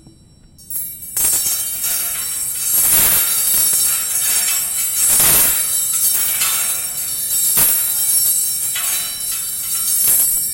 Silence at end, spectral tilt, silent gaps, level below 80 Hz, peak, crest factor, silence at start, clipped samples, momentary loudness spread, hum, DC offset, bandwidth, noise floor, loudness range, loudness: 0 s; 1 dB/octave; none; -46 dBFS; 0 dBFS; 16 dB; 0.6 s; under 0.1%; 9 LU; none; under 0.1%; 16.5 kHz; -46 dBFS; 3 LU; -13 LUFS